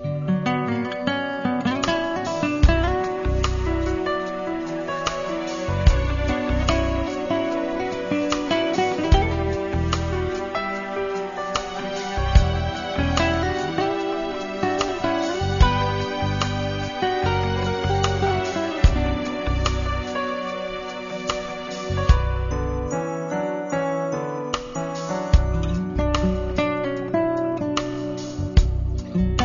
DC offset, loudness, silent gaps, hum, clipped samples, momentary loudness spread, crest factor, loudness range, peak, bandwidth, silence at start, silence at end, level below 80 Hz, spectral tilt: under 0.1%; -24 LUFS; none; none; under 0.1%; 7 LU; 20 dB; 2 LU; -2 dBFS; 7.4 kHz; 0 s; 0 s; -28 dBFS; -6 dB/octave